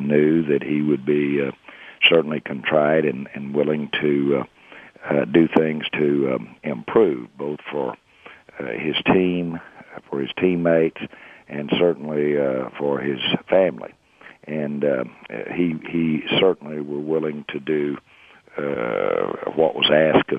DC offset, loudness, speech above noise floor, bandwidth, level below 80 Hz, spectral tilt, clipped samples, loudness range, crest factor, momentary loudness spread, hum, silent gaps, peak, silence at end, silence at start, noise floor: under 0.1%; -21 LUFS; 26 dB; 5 kHz; -58 dBFS; -8 dB/octave; under 0.1%; 4 LU; 22 dB; 14 LU; none; none; 0 dBFS; 0 s; 0 s; -46 dBFS